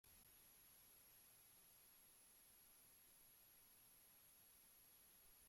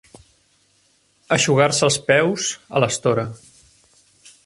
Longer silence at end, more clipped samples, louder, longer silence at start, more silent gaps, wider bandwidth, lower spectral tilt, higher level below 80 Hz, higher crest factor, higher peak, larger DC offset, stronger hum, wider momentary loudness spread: second, 0 s vs 1.1 s; neither; second, -68 LUFS vs -18 LUFS; second, 0.05 s vs 1.3 s; neither; first, 16.5 kHz vs 11.5 kHz; second, -0.5 dB/octave vs -3.5 dB/octave; second, -88 dBFS vs -58 dBFS; second, 12 dB vs 20 dB; second, -58 dBFS vs 0 dBFS; neither; neither; second, 1 LU vs 8 LU